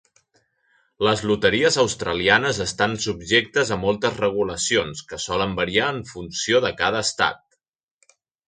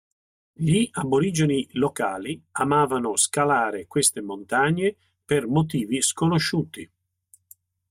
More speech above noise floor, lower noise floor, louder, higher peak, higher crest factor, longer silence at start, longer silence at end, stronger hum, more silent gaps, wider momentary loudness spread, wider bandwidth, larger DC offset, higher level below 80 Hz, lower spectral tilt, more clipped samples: first, 44 dB vs 37 dB; first, -66 dBFS vs -60 dBFS; about the same, -21 LUFS vs -23 LUFS; first, -2 dBFS vs -8 dBFS; first, 22 dB vs 16 dB; first, 1 s vs 0.6 s; about the same, 1.1 s vs 1.05 s; neither; neither; about the same, 8 LU vs 7 LU; second, 9.6 kHz vs 16 kHz; neither; first, -50 dBFS vs -60 dBFS; second, -3 dB/octave vs -4.5 dB/octave; neither